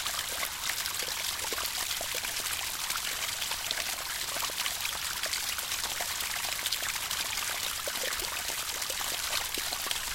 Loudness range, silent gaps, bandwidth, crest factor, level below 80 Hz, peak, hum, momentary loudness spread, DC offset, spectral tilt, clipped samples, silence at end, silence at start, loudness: 0 LU; none; 17 kHz; 22 dB; -56 dBFS; -12 dBFS; none; 2 LU; under 0.1%; 1 dB/octave; under 0.1%; 0 s; 0 s; -31 LUFS